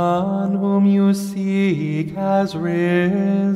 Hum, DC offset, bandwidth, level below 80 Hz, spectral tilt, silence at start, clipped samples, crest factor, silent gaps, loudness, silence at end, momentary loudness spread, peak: none; under 0.1%; 13 kHz; -58 dBFS; -7.5 dB/octave; 0 s; under 0.1%; 12 dB; none; -19 LUFS; 0 s; 6 LU; -6 dBFS